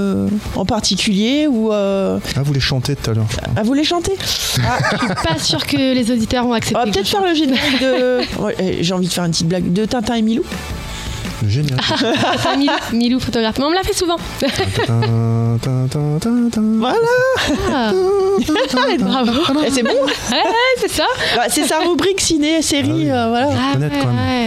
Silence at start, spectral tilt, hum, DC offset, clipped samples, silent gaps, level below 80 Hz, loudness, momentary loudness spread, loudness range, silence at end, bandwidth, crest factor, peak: 0 s; -4.5 dB/octave; none; under 0.1%; under 0.1%; none; -36 dBFS; -16 LUFS; 4 LU; 2 LU; 0 s; 16 kHz; 14 dB; -2 dBFS